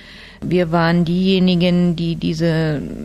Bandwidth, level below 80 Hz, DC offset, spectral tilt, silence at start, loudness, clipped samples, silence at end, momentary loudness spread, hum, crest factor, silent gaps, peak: 8.2 kHz; -40 dBFS; under 0.1%; -7.5 dB/octave; 0 s; -17 LUFS; under 0.1%; 0 s; 6 LU; none; 12 dB; none; -4 dBFS